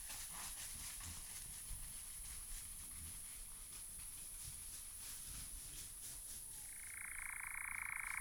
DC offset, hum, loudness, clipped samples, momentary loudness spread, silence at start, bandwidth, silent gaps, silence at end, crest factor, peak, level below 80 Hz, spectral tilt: under 0.1%; none; -48 LUFS; under 0.1%; 5 LU; 0 s; over 20 kHz; none; 0 s; 20 dB; -30 dBFS; -60 dBFS; 0 dB/octave